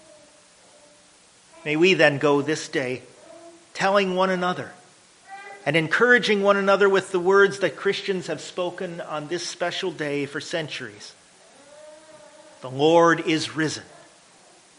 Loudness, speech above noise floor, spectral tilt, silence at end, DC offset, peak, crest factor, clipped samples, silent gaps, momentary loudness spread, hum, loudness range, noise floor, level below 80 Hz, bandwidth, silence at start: -22 LUFS; 32 dB; -4.5 dB/octave; 0.95 s; under 0.1%; -2 dBFS; 22 dB; under 0.1%; none; 18 LU; none; 9 LU; -54 dBFS; -70 dBFS; 10.5 kHz; 1.65 s